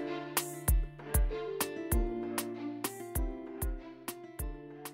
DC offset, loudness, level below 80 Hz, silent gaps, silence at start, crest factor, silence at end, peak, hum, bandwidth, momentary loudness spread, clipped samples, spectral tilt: under 0.1%; -36 LUFS; -38 dBFS; none; 0 s; 22 dB; 0 s; -14 dBFS; none; 16.5 kHz; 10 LU; under 0.1%; -4.5 dB/octave